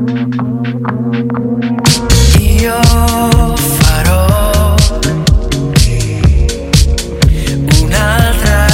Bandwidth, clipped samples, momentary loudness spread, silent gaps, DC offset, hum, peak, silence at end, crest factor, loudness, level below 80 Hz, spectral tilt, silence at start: 17 kHz; 0.2%; 6 LU; none; under 0.1%; none; 0 dBFS; 0 s; 10 dB; -11 LUFS; -14 dBFS; -5 dB/octave; 0 s